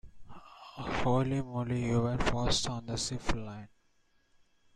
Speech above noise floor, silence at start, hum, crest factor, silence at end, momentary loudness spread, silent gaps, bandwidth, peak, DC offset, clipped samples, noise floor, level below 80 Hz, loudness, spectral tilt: 38 dB; 0.05 s; none; 20 dB; 1.1 s; 15 LU; none; 12 kHz; -14 dBFS; under 0.1%; under 0.1%; -69 dBFS; -44 dBFS; -32 LUFS; -5 dB/octave